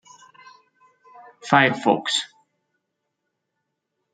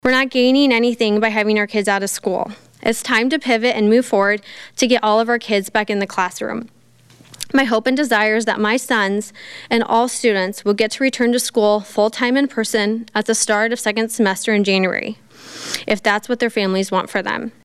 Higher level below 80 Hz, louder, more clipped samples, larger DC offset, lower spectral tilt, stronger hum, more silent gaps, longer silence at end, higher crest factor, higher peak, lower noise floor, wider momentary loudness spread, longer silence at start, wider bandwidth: second, -70 dBFS vs -58 dBFS; second, -20 LUFS vs -17 LUFS; neither; neither; about the same, -4 dB/octave vs -3.5 dB/octave; neither; neither; first, 1.9 s vs 0.15 s; first, 24 dB vs 14 dB; about the same, -2 dBFS vs -4 dBFS; first, -79 dBFS vs -49 dBFS; first, 20 LU vs 9 LU; first, 1.2 s vs 0.05 s; second, 9.4 kHz vs 15 kHz